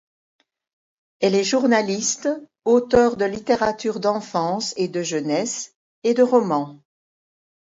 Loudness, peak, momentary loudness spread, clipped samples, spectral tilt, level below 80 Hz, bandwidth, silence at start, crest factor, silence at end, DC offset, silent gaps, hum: -21 LUFS; -4 dBFS; 9 LU; under 0.1%; -4 dB/octave; -56 dBFS; 7.8 kHz; 1.2 s; 18 dB; 0.9 s; under 0.1%; 5.75-6.02 s; none